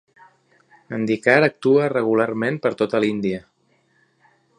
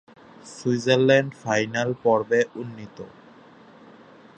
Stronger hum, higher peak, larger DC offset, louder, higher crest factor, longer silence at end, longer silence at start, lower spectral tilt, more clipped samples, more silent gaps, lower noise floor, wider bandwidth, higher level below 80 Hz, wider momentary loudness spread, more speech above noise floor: neither; about the same, -2 dBFS vs -4 dBFS; neither; about the same, -20 LUFS vs -22 LUFS; about the same, 20 dB vs 20 dB; about the same, 1.2 s vs 1.3 s; first, 0.9 s vs 0.45 s; first, -7 dB/octave vs -5.5 dB/octave; neither; neither; first, -63 dBFS vs -49 dBFS; about the same, 9.8 kHz vs 9.2 kHz; about the same, -64 dBFS vs -68 dBFS; second, 10 LU vs 23 LU; first, 44 dB vs 27 dB